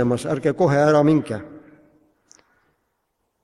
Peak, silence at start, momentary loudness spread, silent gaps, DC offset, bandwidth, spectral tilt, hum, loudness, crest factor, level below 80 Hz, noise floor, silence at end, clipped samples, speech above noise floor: -6 dBFS; 0 s; 13 LU; none; under 0.1%; 12 kHz; -7.5 dB/octave; none; -19 LUFS; 16 dB; -58 dBFS; -73 dBFS; 1.85 s; under 0.1%; 55 dB